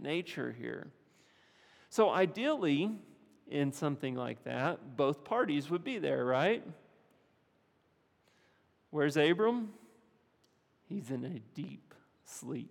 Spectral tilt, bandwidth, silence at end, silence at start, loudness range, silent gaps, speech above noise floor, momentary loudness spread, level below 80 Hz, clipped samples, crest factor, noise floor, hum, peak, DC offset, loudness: -6 dB/octave; 17 kHz; 0 s; 0 s; 3 LU; none; 39 dB; 17 LU; -86 dBFS; under 0.1%; 22 dB; -73 dBFS; none; -14 dBFS; under 0.1%; -34 LUFS